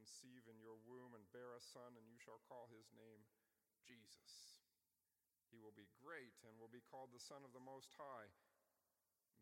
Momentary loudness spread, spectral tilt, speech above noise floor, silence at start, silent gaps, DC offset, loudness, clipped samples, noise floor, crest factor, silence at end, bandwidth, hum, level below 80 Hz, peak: 9 LU; -3.5 dB/octave; over 27 dB; 0 s; none; under 0.1%; -62 LUFS; under 0.1%; under -90 dBFS; 20 dB; 0 s; 17 kHz; none; under -90 dBFS; -44 dBFS